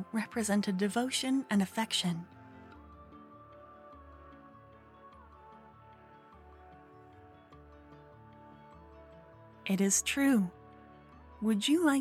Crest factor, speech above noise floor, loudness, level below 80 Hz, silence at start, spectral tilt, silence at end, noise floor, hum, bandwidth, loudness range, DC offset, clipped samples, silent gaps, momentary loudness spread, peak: 20 dB; 26 dB; -31 LUFS; -66 dBFS; 0 s; -4 dB/octave; 0 s; -56 dBFS; none; 16 kHz; 23 LU; under 0.1%; under 0.1%; none; 27 LU; -16 dBFS